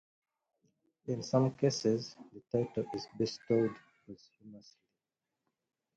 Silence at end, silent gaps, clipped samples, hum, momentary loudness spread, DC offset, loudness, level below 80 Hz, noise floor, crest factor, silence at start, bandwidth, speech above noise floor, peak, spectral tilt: 1.35 s; none; under 0.1%; none; 23 LU; under 0.1%; -34 LUFS; -72 dBFS; -90 dBFS; 22 dB; 1.05 s; 9 kHz; 55 dB; -16 dBFS; -6 dB/octave